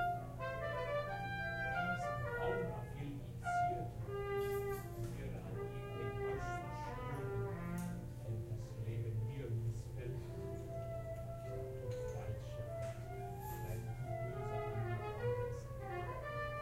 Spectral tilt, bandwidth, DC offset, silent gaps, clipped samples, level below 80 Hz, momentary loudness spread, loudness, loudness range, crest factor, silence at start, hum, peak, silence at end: -7 dB/octave; 16 kHz; under 0.1%; none; under 0.1%; -54 dBFS; 7 LU; -43 LUFS; 5 LU; 16 dB; 0 s; none; -26 dBFS; 0 s